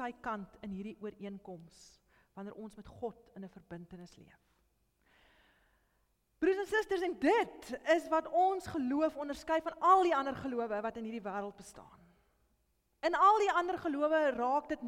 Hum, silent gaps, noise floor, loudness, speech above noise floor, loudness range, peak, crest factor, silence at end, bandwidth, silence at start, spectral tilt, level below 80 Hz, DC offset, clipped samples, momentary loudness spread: none; none; -77 dBFS; -33 LUFS; 43 dB; 18 LU; -16 dBFS; 20 dB; 0 s; 16 kHz; 0 s; -5 dB/octave; -68 dBFS; under 0.1%; under 0.1%; 23 LU